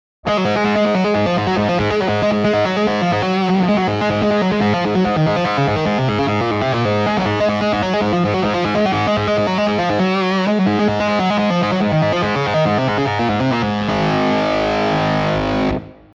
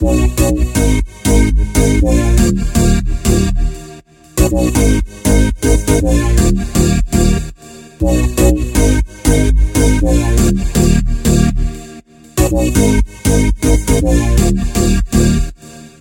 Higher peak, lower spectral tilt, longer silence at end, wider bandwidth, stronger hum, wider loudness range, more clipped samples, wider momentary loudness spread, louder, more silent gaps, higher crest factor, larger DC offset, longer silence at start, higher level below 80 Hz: second, -6 dBFS vs 0 dBFS; about the same, -6.5 dB/octave vs -5.5 dB/octave; about the same, 0.25 s vs 0.15 s; second, 7.6 kHz vs 17 kHz; neither; about the same, 1 LU vs 1 LU; neither; about the same, 2 LU vs 4 LU; second, -17 LUFS vs -14 LUFS; neither; about the same, 10 dB vs 12 dB; neither; first, 0.25 s vs 0 s; second, -42 dBFS vs -16 dBFS